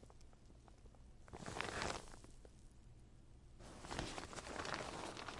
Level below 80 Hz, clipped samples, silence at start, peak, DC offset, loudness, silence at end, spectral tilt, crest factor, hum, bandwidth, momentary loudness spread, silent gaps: -60 dBFS; under 0.1%; 0 s; -20 dBFS; under 0.1%; -48 LUFS; 0 s; -3.5 dB/octave; 30 dB; none; 11.5 kHz; 20 LU; none